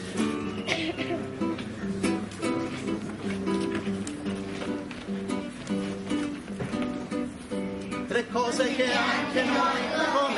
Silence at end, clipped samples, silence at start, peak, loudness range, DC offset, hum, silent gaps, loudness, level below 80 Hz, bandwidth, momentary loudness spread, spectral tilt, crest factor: 0 s; under 0.1%; 0 s; -10 dBFS; 5 LU; under 0.1%; none; none; -29 LUFS; -56 dBFS; 11.5 kHz; 9 LU; -5 dB/octave; 20 dB